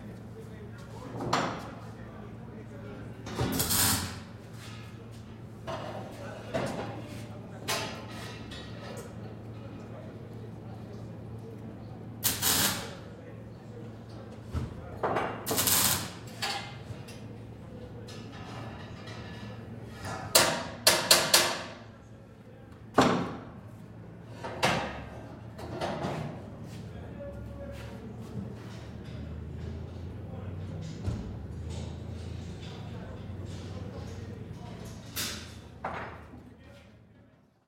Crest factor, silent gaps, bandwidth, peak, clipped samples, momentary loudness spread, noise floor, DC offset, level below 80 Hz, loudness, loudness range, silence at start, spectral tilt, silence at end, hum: 32 dB; none; 16.5 kHz; -4 dBFS; under 0.1%; 21 LU; -60 dBFS; under 0.1%; -54 dBFS; -31 LUFS; 16 LU; 0 s; -3 dB/octave; 0.4 s; none